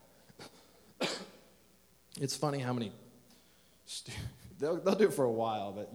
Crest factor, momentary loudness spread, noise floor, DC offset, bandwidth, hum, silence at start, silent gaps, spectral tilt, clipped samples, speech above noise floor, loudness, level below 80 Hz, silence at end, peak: 22 dB; 24 LU; -66 dBFS; under 0.1%; over 20 kHz; none; 0.4 s; none; -5 dB/octave; under 0.1%; 32 dB; -35 LUFS; -66 dBFS; 0 s; -14 dBFS